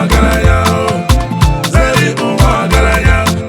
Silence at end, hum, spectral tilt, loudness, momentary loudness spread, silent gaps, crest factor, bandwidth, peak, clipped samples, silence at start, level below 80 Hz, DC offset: 0 s; none; -5.5 dB/octave; -11 LUFS; 3 LU; none; 10 dB; 17 kHz; 0 dBFS; 0.2%; 0 s; -14 dBFS; under 0.1%